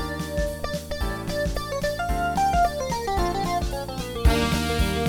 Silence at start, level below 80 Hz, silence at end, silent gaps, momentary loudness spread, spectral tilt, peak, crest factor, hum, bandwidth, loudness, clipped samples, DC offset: 0 s; -30 dBFS; 0 s; none; 8 LU; -5 dB/octave; -6 dBFS; 18 dB; none; 19 kHz; -25 LUFS; under 0.1%; under 0.1%